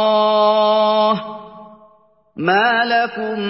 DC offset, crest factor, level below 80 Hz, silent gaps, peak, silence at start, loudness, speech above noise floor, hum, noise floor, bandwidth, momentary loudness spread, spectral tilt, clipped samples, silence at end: under 0.1%; 12 dB; -66 dBFS; none; -4 dBFS; 0 s; -15 LUFS; 38 dB; none; -54 dBFS; 5.8 kHz; 9 LU; -8.5 dB/octave; under 0.1%; 0 s